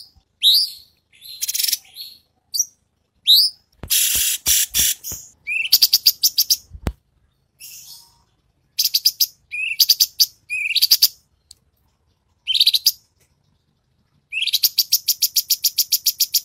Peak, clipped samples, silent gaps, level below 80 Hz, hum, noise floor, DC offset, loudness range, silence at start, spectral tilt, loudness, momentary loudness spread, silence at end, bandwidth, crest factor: -2 dBFS; under 0.1%; none; -46 dBFS; none; -66 dBFS; under 0.1%; 5 LU; 0.4 s; 2 dB/octave; -16 LUFS; 18 LU; 0 s; 16.5 kHz; 20 dB